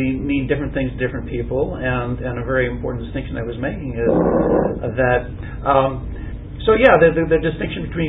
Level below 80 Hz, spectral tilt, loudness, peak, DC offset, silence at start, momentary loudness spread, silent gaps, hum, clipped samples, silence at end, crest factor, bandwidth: -32 dBFS; -10 dB/octave; -19 LUFS; 0 dBFS; under 0.1%; 0 s; 13 LU; none; none; under 0.1%; 0 s; 18 dB; 4 kHz